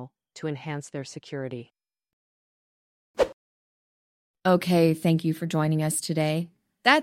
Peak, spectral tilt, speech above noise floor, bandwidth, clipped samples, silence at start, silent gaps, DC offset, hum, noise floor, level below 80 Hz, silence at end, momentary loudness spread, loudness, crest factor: -4 dBFS; -5 dB/octave; over 65 dB; 16 kHz; under 0.1%; 0 s; 2.13-3.14 s, 3.33-4.34 s; under 0.1%; none; under -90 dBFS; -62 dBFS; 0 s; 15 LU; -26 LUFS; 24 dB